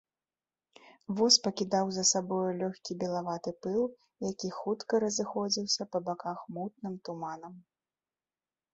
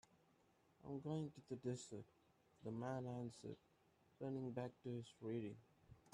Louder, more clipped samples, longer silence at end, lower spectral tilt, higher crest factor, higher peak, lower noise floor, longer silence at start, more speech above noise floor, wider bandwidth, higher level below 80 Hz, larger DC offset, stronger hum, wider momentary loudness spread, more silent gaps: first, -31 LUFS vs -51 LUFS; neither; first, 1.15 s vs 0.05 s; second, -3 dB/octave vs -7 dB/octave; about the same, 22 dB vs 18 dB; first, -10 dBFS vs -34 dBFS; first, under -90 dBFS vs -77 dBFS; first, 0.85 s vs 0.15 s; first, over 58 dB vs 28 dB; second, 8.4 kHz vs 11 kHz; first, -76 dBFS vs -82 dBFS; neither; neither; first, 14 LU vs 10 LU; neither